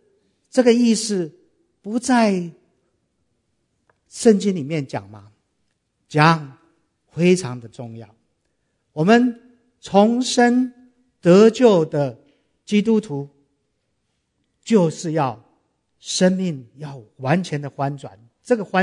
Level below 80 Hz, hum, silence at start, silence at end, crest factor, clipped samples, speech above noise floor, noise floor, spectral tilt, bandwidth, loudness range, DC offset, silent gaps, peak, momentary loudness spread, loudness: -66 dBFS; none; 0.55 s; 0 s; 20 dB; under 0.1%; 54 dB; -72 dBFS; -5.5 dB/octave; 11 kHz; 7 LU; under 0.1%; none; 0 dBFS; 21 LU; -18 LUFS